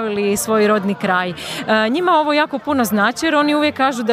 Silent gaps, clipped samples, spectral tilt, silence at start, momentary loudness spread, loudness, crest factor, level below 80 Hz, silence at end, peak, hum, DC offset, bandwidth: none; under 0.1%; -4 dB/octave; 0 s; 4 LU; -16 LUFS; 14 dB; -54 dBFS; 0 s; -2 dBFS; none; under 0.1%; 15.5 kHz